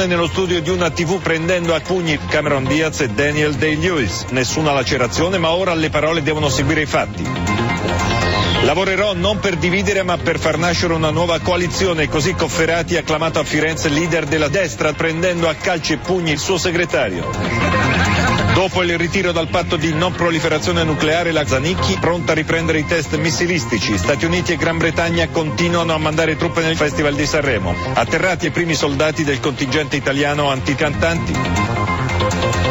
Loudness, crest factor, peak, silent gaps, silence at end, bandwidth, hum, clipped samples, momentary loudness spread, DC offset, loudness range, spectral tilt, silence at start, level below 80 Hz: -17 LUFS; 12 dB; -4 dBFS; none; 0 s; 16.5 kHz; none; under 0.1%; 3 LU; under 0.1%; 1 LU; -4.5 dB/octave; 0 s; -36 dBFS